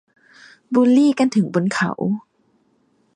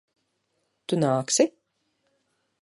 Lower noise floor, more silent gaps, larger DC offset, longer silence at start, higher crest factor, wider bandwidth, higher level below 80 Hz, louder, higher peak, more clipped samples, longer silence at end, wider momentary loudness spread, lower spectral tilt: second, -62 dBFS vs -75 dBFS; neither; neither; second, 0.7 s vs 0.9 s; second, 16 dB vs 22 dB; second, 10 kHz vs 11.5 kHz; first, -66 dBFS vs -72 dBFS; first, -18 LUFS vs -24 LUFS; first, -4 dBFS vs -8 dBFS; neither; second, 0.95 s vs 1.15 s; about the same, 10 LU vs 9 LU; first, -6.5 dB/octave vs -4 dB/octave